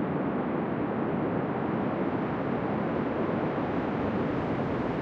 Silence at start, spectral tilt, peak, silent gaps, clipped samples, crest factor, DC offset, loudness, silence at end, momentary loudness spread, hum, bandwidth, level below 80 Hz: 0 s; -9.5 dB/octave; -18 dBFS; none; under 0.1%; 12 dB; under 0.1%; -30 LUFS; 0 s; 1 LU; none; 6.6 kHz; -54 dBFS